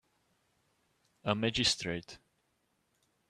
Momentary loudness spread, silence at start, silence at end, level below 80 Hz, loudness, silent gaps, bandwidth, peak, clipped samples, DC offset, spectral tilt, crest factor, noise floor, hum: 12 LU; 1.25 s; 1.15 s; -62 dBFS; -32 LUFS; none; 13.5 kHz; -12 dBFS; under 0.1%; under 0.1%; -3.5 dB/octave; 26 dB; -78 dBFS; none